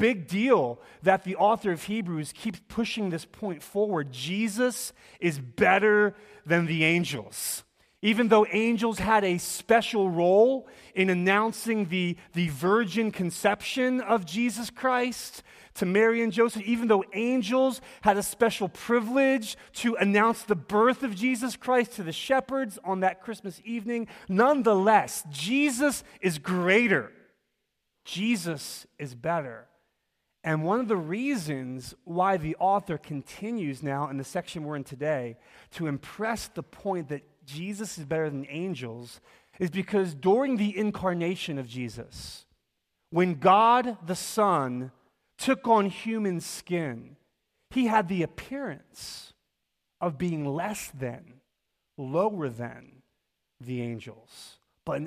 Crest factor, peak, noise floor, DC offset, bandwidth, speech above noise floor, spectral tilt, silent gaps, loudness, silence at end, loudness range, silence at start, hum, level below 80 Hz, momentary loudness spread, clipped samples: 22 dB; -6 dBFS; -81 dBFS; under 0.1%; 15.5 kHz; 54 dB; -5 dB/octave; none; -27 LUFS; 0 s; 9 LU; 0 s; none; -62 dBFS; 15 LU; under 0.1%